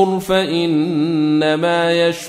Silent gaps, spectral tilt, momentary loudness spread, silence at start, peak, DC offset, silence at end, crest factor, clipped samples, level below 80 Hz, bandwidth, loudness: none; -5.5 dB/octave; 2 LU; 0 s; -2 dBFS; under 0.1%; 0 s; 12 dB; under 0.1%; -52 dBFS; 15.5 kHz; -16 LUFS